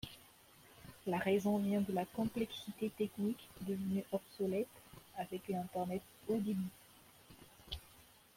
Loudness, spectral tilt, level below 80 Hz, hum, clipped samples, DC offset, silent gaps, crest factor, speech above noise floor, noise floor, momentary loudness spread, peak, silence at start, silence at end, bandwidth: -40 LUFS; -6.5 dB/octave; -66 dBFS; none; under 0.1%; under 0.1%; none; 18 dB; 25 dB; -64 dBFS; 23 LU; -22 dBFS; 0.05 s; 0.35 s; 16.5 kHz